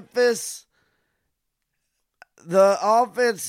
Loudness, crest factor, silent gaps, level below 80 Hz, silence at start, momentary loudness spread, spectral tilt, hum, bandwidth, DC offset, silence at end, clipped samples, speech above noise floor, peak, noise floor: -20 LUFS; 18 dB; none; -76 dBFS; 0.15 s; 14 LU; -3.5 dB/octave; none; 16 kHz; under 0.1%; 0 s; under 0.1%; 58 dB; -6 dBFS; -78 dBFS